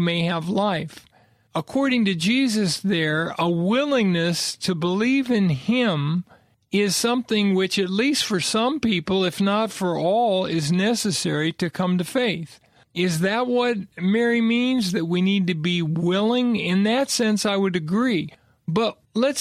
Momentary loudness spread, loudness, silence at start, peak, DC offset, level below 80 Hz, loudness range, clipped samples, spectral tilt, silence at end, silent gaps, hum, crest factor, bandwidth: 5 LU; -22 LUFS; 0 s; -8 dBFS; under 0.1%; -60 dBFS; 2 LU; under 0.1%; -5 dB/octave; 0 s; none; none; 12 dB; 14.5 kHz